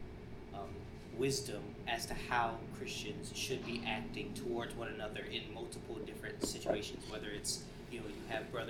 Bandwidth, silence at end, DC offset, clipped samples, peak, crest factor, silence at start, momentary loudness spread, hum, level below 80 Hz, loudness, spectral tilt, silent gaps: 17 kHz; 0 s; under 0.1%; under 0.1%; -20 dBFS; 22 dB; 0 s; 11 LU; none; -56 dBFS; -41 LUFS; -3.5 dB/octave; none